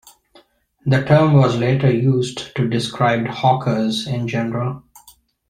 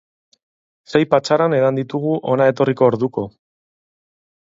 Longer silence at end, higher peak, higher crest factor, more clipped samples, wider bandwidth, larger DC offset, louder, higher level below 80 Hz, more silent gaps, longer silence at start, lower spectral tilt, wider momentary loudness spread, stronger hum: second, 0.7 s vs 1.2 s; about the same, -2 dBFS vs 0 dBFS; about the same, 16 dB vs 18 dB; neither; first, 11 kHz vs 7.8 kHz; neither; about the same, -18 LUFS vs -17 LUFS; first, -52 dBFS vs -60 dBFS; neither; about the same, 0.85 s vs 0.9 s; about the same, -7 dB/octave vs -7 dB/octave; first, 10 LU vs 7 LU; neither